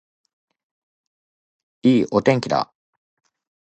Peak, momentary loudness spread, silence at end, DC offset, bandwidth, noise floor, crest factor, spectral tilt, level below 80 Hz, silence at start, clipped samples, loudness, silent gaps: -2 dBFS; 7 LU; 1.15 s; under 0.1%; 8.6 kHz; under -90 dBFS; 22 dB; -6.5 dB/octave; -60 dBFS; 1.85 s; under 0.1%; -19 LUFS; none